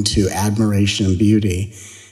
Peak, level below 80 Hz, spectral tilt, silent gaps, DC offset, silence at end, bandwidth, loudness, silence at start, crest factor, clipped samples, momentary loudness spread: -2 dBFS; -38 dBFS; -5.5 dB/octave; none; under 0.1%; 0.1 s; 14.5 kHz; -17 LUFS; 0 s; 14 dB; under 0.1%; 11 LU